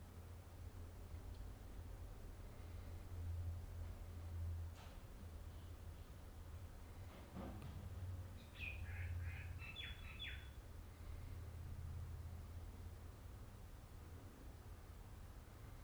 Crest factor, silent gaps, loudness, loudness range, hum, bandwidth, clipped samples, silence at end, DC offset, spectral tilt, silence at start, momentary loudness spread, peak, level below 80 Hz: 16 dB; none; -54 LUFS; 5 LU; none; over 20 kHz; under 0.1%; 0 s; under 0.1%; -5.5 dB/octave; 0 s; 9 LU; -36 dBFS; -56 dBFS